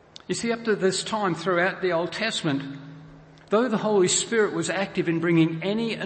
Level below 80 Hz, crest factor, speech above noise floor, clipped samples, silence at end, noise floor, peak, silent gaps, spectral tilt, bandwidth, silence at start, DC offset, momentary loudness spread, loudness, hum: -64 dBFS; 14 dB; 24 dB; under 0.1%; 0 s; -48 dBFS; -10 dBFS; none; -4 dB/octave; 8.8 kHz; 0.3 s; under 0.1%; 8 LU; -24 LUFS; none